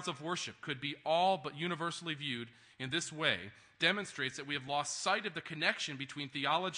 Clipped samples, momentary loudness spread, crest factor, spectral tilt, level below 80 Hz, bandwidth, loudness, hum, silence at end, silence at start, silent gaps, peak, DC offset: under 0.1%; 8 LU; 22 dB; -3 dB/octave; -80 dBFS; 10.5 kHz; -36 LUFS; none; 0 s; 0 s; none; -14 dBFS; under 0.1%